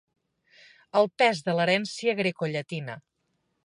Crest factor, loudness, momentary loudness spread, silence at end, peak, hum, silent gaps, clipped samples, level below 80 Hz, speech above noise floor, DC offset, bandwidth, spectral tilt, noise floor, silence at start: 20 dB; -26 LUFS; 13 LU; 0.65 s; -8 dBFS; none; none; under 0.1%; -76 dBFS; 50 dB; under 0.1%; 11.5 kHz; -5 dB/octave; -76 dBFS; 0.95 s